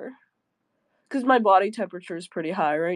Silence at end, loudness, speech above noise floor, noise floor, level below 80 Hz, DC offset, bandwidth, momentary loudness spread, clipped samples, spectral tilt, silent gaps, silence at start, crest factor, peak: 0 s; -23 LUFS; 53 dB; -76 dBFS; -84 dBFS; under 0.1%; 11 kHz; 16 LU; under 0.1%; -6 dB/octave; none; 0 s; 18 dB; -6 dBFS